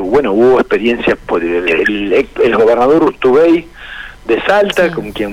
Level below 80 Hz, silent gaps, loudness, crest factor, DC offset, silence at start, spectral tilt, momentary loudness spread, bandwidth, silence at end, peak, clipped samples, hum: -38 dBFS; none; -11 LUFS; 8 dB; under 0.1%; 0 s; -6 dB/octave; 8 LU; 14.5 kHz; 0 s; -4 dBFS; under 0.1%; none